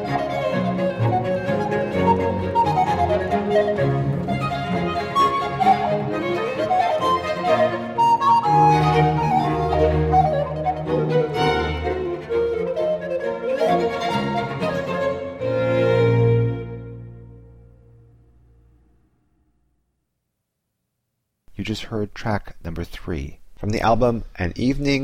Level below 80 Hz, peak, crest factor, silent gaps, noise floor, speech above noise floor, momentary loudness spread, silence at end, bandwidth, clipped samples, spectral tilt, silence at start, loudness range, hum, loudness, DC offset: -38 dBFS; -4 dBFS; 16 dB; none; -77 dBFS; 54 dB; 11 LU; 0 s; 14 kHz; under 0.1%; -7 dB/octave; 0 s; 12 LU; none; -21 LUFS; under 0.1%